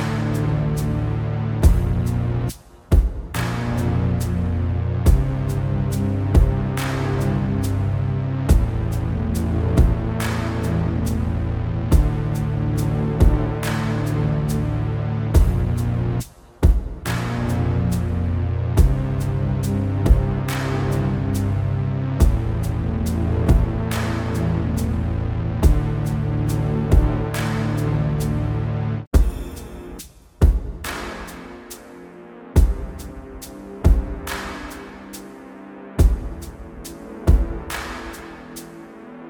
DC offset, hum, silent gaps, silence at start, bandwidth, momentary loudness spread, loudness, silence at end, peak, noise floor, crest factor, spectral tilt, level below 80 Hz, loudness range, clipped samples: under 0.1%; none; 29.07-29.11 s; 0 s; 19.5 kHz; 17 LU; -22 LUFS; 0 s; -2 dBFS; -40 dBFS; 18 dB; -7 dB/octave; -24 dBFS; 4 LU; under 0.1%